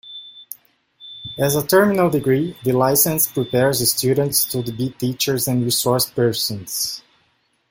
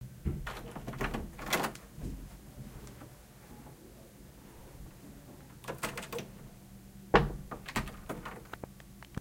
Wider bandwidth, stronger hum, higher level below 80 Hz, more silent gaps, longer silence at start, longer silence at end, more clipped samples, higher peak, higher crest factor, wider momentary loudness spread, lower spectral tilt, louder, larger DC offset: about the same, 17 kHz vs 17 kHz; neither; second, -54 dBFS vs -48 dBFS; neither; about the same, 0.05 s vs 0 s; first, 0.7 s vs 0 s; neither; first, -2 dBFS vs -6 dBFS; second, 18 dB vs 34 dB; about the same, 19 LU vs 20 LU; about the same, -4 dB/octave vs -4.5 dB/octave; first, -18 LUFS vs -37 LUFS; neither